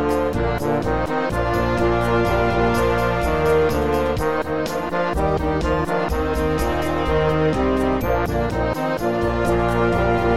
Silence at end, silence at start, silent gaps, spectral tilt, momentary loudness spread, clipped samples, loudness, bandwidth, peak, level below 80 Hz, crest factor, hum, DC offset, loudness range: 0 s; 0 s; none; -6.5 dB/octave; 4 LU; under 0.1%; -20 LUFS; 16 kHz; -6 dBFS; -30 dBFS; 12 dB; none; 2%; 2 LU